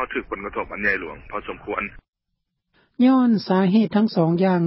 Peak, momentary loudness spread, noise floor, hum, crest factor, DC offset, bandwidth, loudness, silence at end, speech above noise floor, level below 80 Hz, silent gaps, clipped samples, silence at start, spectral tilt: -6 dBFS; 14 LU; -78 dBFS; none; 14 dB; under 0.1%; 5.8 kHz; -21 LUFS; 0 s; 57 dB; -50 dBFS; 2.08-2.12 s; under 0.1%; 0 s; -11.5 dB/octave